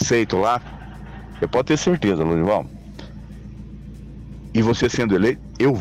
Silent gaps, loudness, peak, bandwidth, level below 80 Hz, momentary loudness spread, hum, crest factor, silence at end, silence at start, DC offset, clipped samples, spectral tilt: none; -20 LUFS; -10 dBFS; 13 kHz; -40 dBFS; 20 LU; none; 12 dB; 0 s; 0 s; under 0.1%; under 0.1%; -5.5 dB/octave